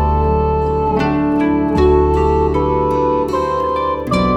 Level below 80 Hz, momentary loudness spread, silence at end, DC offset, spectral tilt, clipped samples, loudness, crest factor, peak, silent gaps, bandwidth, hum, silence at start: -24 dBFS; 4 LU; 0 s; under 0.1%; -8.5 dB/octave; under 0.1%; -15 LUFS; 12 dB; -2 dBFS; none; 9.6 kHz; none; 0 s